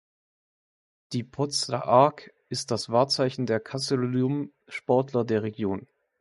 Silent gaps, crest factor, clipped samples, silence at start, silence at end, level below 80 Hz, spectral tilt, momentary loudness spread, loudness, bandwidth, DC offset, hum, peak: none; 22 dB; under 0.1%; 1.1 s; 0.4 s; -64 dBFS; -5 dB/octave; 13 LU; -26 LUFS; 11.5 kHz; under 0.1%; none; -4 dBFS